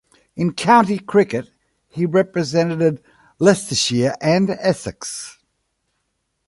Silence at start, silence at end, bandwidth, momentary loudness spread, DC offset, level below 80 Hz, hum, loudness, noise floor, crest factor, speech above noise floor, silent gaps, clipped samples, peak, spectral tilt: 0.35 s; 1.15 s; 11.5 kHz; 15 LU; under 0.1%; -56 dBFS; none; -18 LUFS; -72 dBFS; 18 dB; 54 dB; none; under 0.1%; 0 dBFS; -5 dB/octave